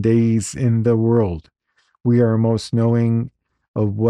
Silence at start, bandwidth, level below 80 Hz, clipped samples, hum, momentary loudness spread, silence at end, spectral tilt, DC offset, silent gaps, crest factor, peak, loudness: 0 s; 11 kHz; -48 dBFS; under 0.1%; none; 9 LU; 0 s; -8 dB/octave; under 0.1%; 3.68-3.74 s; 12 dB; -6 dBFS; -18 LUFS